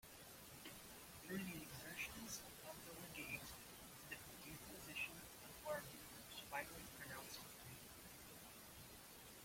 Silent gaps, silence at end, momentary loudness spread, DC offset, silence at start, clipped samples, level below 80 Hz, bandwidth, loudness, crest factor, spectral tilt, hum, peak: none; 0 s; 9 LU; under 0.1%; 0 s; under 0.1%; -72 dBFS; 16.5 kHz; -53 LUFS; 20 dB; -3 dB/octave; none; -34 dBFS